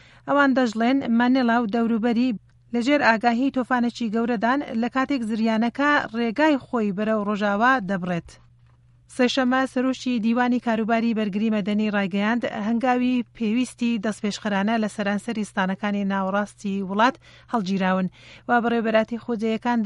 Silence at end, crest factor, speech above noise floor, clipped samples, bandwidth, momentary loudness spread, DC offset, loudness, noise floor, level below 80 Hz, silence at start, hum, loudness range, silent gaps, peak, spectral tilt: 0 s; 20 dB; 33 dB; under 0.1%; 11.5 kHz; 7 LU; under 0.1%; -23 LUFS; -55 dBFS; -60 dBFS; 0.25 s; none; 3 LU; none; -4 dBFS; -6 dB/octave